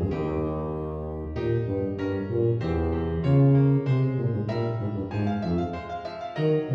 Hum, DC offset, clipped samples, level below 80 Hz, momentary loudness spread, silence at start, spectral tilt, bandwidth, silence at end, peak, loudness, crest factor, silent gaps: none; under 0.1%; under 0.1%; -42 dBFS; 11 LU; 0 s; -10 dB/octave; 5.8 kHz; 0 s; -12 dBFS; -26 LUFS; 14 dB; none